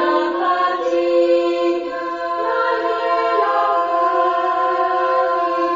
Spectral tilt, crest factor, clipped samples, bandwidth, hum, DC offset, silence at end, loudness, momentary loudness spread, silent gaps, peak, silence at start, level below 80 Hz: -4 dB/octave; 12 dB; under 0.1%; 7.6 kHz; none; under 0.1%; 0 s; -18 LUFS; 4 LU; none; -4 dBFS; 0 s; -62 dBFS